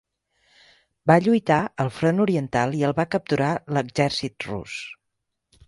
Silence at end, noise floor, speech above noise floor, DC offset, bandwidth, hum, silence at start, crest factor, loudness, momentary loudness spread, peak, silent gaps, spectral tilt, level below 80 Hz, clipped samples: 0.75 s; -79 dBFS; 57 dB; under 0.1%; 11.5 kHz; none; 1.05 s; 22 dB; -23 LUFS; 13 LU; -2 dBFS; none; -6.5 dB/octave; -56 dBFS; under 0.1%